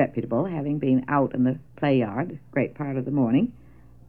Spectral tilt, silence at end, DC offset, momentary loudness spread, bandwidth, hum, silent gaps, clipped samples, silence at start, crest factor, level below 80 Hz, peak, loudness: -10.5 dB/octave; 0.6 s; 0.2%; 7 LU; 4.5 kHz; none; none; under 0.1%; 0 s; 16 dB; -56 dBFS; -8 dBFS; -25 LUFS